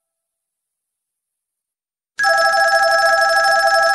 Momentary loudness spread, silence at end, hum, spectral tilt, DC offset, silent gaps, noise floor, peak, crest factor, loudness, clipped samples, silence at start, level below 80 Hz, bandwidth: 2 LU; 0 s; none; 1.5 dB/octave; under 0.1%; none; -89 dBFS; -2 dBFS; 14 dB; -13 LUFS; under 0.1%; 2.2 s; -60 dBFS; 12.5 kHz